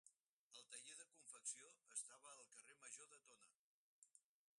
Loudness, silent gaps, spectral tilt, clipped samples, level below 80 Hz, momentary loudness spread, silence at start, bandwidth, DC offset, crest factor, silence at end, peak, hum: -57 LUFS; 0.20-0.51 s, 3.55-4.02 s; 2 dB/octave; under 0.1%; under -90 dBFS; 13 LU; 0.05 s; 11.5 kHz; under 0.1%; 26 dB; 0.4 s; -36 dBFS; none